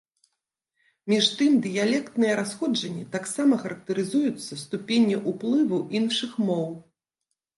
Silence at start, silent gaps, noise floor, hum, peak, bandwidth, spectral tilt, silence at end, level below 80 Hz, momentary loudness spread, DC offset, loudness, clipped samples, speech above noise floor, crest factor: 1.05 s; none; -82 dBFS; none; -8 dBFS; 11.5 kHz; -4.5 dB/octave; 0.75 s; -74 dBFS; 10 LU; under 0.1%; -25 LUFS; under 0.1%; 58 dB; 18 dB